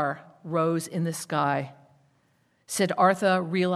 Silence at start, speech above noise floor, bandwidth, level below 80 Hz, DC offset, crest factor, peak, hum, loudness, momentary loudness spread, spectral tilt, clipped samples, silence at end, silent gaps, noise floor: 0 s; 42 dB; 14.5 kHz; -76 dBFS; under 0.1%; 20 dB; -8 dBFS; none; -26 LUFS; 10 LU; -5 dB/octave; under 0.1%; 0 s; none; -68 dBFS